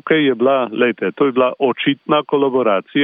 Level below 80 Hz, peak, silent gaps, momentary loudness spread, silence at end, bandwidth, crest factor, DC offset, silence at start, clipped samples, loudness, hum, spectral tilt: -68 dBFS; -2 dBFS; none; 3 LU; 0 s; 3.9 kHz; 14 dB; under 0.1%; 0.05 s; under 0.1%; -16 LUFS; none; -9.5 dB/octave